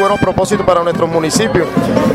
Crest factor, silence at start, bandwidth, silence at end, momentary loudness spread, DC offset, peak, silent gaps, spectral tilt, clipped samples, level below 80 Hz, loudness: 12 dB; 0 s; 16 kHz; 0 s; 2 LU; under 0.1%; 0 dBFS; none; -5 dB/octave; under 0.1%; -36 dBFS; -13 LUFS